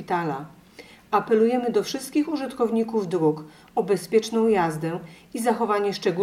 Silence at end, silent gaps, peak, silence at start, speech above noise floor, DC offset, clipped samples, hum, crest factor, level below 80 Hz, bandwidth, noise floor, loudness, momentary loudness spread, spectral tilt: 0 s; none; -6 dBFS; 0 s; 25 dB; under 0.1%; under 0.1%; none; 16 dB; -64 dBFS; 16 kHz; -48 dBFS; -24 LUFS; 10 LU; -5.5 dB/octave